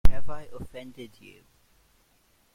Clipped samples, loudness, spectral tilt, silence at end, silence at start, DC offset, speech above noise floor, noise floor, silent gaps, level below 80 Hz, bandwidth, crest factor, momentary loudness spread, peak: under 0.1%; -40 LUFS; -6.5 dB/octave; 1.5 s; 0.05 s; under 0.1%; 31 dB; -65 dBFS; none; -34 dBFS; 5.4 kHz; 20 dB; 14 LU; -4 dBFS